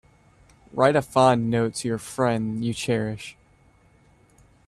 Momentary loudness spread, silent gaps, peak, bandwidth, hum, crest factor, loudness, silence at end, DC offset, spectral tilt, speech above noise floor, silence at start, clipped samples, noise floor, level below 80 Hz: 13 LU; none; -4 dBFS; 13.5 kHz; none; 20 dB; -23 LUFS; 1.35 s; under 0.1%; -5.5 dB/octave; 35 dB; 0.75 s; under 0.1%; -58 dBFS; -56 dBFS